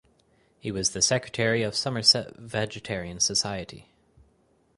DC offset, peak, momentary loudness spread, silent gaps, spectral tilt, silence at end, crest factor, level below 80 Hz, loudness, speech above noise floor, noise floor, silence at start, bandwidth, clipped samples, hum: under 0.1%; -6 dBFS; 14 LU; none; -2.5 dB/octave; 0.95 s; 22 dB; -56 dBFS; -25 LUFS; 38 dB; -65 dBFS; 0.65 s; 11.5 kHz; under 0.1%; none